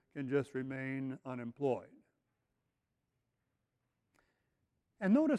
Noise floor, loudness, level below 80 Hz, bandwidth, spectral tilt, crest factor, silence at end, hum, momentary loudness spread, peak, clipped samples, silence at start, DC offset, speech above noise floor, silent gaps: -86 dBFS; -38 LUFS; -80 dBFS; 10.5 kHz; -8.5 dB/octave; 20 dB; 0 s; none; 10 LU; -20 dBFS; under 0.1%; 0.15 s; under 0.1%; 50 dB; none